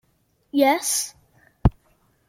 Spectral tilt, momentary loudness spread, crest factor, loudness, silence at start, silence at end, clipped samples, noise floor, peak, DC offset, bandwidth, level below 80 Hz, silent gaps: -4.5 dB/octave; 8 LU; 22 dB; -22 LUFS; 0.55 s; 0.6 s; under 0.1%; -66 dBFS; -2 dBFS; under 0.1%; 16.5 kHz; -34 dBFS; none